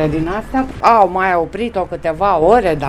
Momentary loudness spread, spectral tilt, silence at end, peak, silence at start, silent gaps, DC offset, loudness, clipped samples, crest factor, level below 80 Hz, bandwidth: 9 LU; -7 dB/octave; 0 s; 0 dBFS; 0 s; none; under 0.1%; -15 LUFS; 0.2%; 14 dB; -34 dBFS; 14.5 kHz